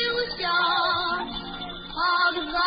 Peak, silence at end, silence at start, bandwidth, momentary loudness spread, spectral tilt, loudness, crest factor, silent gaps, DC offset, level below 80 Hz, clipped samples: -12 dBFS; 0 s; 0 s; 5.2 kHz; 12 LU; -7.5 dB/octave; -24 LUFS; 14 dB; none; under 0.1%; -48 dBFS; under 0.1%